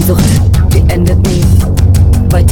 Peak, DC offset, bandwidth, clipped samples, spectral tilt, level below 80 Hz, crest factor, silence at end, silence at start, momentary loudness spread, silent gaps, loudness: 0 dBFS; under 0.1%; 17.5 kHz; 2%; -6.5 dB/octave; -12 dBFS; 6 dB; 0 s; 0 s; 1 LU; none; -9 LUFS